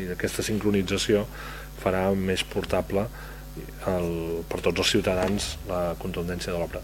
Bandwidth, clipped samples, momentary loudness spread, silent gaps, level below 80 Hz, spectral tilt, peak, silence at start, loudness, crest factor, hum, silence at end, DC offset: over 20 kHz; under 0.1%; 11 LU; none; -42 dBFS; -4.5 dB/octave; -8 dBFS; 0 s; -27 LUFS; 20 dB; none; 0 s; under 0.1%